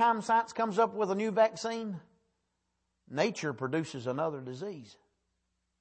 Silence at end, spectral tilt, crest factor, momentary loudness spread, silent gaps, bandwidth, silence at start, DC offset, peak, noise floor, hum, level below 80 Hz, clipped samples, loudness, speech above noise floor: 0.85 s; -5.5 dB/octave; 18 dB; 13 LU; none; 8.8 kHz; 0 s; under 0.1%; -14 dBFS; -81 dBFS; none; -78 dBFS; under 0.1%; -32 LUFS; 50 dB